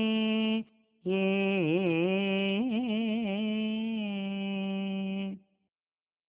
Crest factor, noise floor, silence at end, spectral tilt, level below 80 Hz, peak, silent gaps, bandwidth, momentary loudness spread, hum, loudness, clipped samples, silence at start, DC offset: 14 dB; under -90 dBFS; 0.9 s; -5 dB/octave; -72 dBFS; -16 dBFS; none; 4 kHz; 7 LU; none; -30 LUFS; under 0.1%; 0 s; under 0.1%